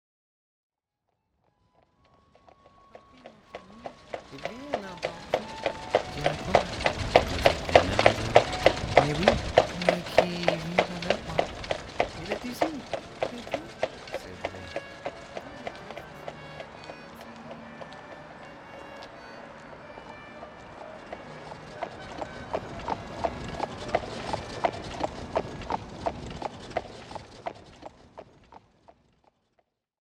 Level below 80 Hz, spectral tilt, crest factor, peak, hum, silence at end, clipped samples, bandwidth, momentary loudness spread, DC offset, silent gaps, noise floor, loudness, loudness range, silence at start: -48 dBFS; -4.5 dB/octave; 30 dB; -2 dBFS; none; 1.45 s; under 0.1%; 16 kHz; 21 LU; under 0.1%; none; -81 dBFS; -28 LUFS; 20 LU; 2.95 s